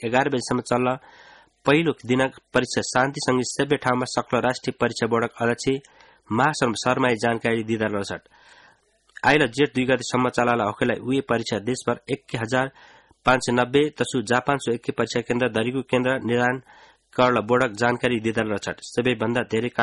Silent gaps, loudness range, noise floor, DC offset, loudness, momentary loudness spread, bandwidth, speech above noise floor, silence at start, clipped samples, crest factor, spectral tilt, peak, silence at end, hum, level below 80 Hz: none; 2 LU; -59 dBFS; under 0.1%; -23 LUFS; 6 LU; 11.5 kHz; 36 dB; 0 s; under 0.1%; 18 dB; -5 dB/octave; -4 dBFS; 0 s; none; -56 dBFS